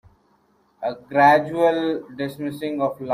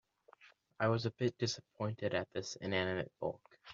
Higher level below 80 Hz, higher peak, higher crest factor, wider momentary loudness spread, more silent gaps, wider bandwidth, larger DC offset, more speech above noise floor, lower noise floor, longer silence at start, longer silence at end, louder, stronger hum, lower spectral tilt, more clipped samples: first, -62 dBFS vs -74 dBFS; first, -4 dBFS vs -18 dBFS; about the same, 18 dB vs 20 dB; first, 15 LU vs 8 LU; neither; first, 15.5 kHz vs 7.4 kHz; neither; first, 41 dB vs 27 dB; about the same, -62 dBFS vs -65 dBFS; first, 0.8 s vs 0.4 s; about the same, 0 s vs 0 s; first, -21 LUFS vs -38 LUFS; neither; first, -6.5 dB/octave vs -4.5 dB/octave; neither